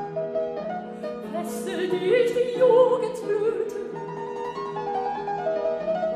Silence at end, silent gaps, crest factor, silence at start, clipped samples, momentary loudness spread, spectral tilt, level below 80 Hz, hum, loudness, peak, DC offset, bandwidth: 0 s; none; 18 dB; 0 s; under 0.1%; 14 LU; -5.5 dB/octave; -64 dBFS; none; -25 LUFS; -8 dBFS; under 0.1%; 14 kHz